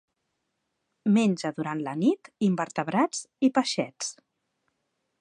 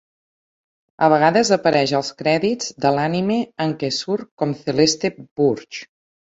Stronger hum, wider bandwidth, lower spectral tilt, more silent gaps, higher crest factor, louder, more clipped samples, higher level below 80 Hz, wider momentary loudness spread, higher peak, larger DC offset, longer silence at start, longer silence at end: neither; first, 11 kHz vs 8 kHz; about the same, -5 dB/octave vs -4.5 dB/octave; second, none vs 4.31-4.37 s, 5.31-5.36 s; about the same, 20 dB vs 18 dB; second, -27 LUFS vs -19 LUFS; neither; second, -78 dBFS vs -60 dBFS; about the same, 9 LU vs 10 LU; second, -8 dBFS vs -2 dBFS; neither; about the same, 1.05 s vs 1 s; first, 1.1 s vs 0.4 s